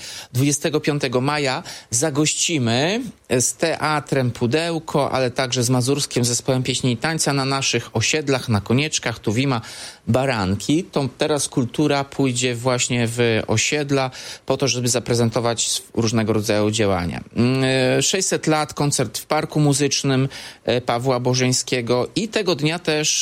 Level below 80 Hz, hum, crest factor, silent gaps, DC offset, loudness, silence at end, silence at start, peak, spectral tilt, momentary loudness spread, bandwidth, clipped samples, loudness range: -52 dBFS; none; 16 dB; none; under 0.1%; -20 LUFS; 0 s; 0 s; -4 dBFS; -4 dB/octave; 4 LU; 16 kHz; under 0.1%; 1 LU